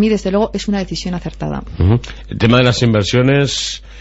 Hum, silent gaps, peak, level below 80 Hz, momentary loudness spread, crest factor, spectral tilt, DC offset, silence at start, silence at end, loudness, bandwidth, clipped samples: none; none; -2 dBFS; -32 dBFS; 12 LU; 14 dB; -5.5 dB/octave; under 0.1%; 0 s; 0 s; -15 LUFS; 8.2 kHz; under 0.1%